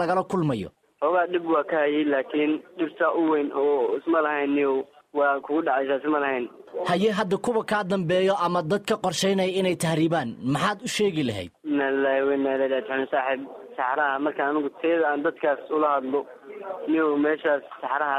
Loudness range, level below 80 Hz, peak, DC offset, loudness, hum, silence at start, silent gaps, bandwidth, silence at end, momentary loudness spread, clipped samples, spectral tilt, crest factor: 1 LU; -66 dBFS; -10 dBFS; under 0.1%; -25 LUFS; none; 0 s; none; 14.5 kHz; 0 s; 7 LU; under 0.1%; -5.5 dB/octave; 14 dB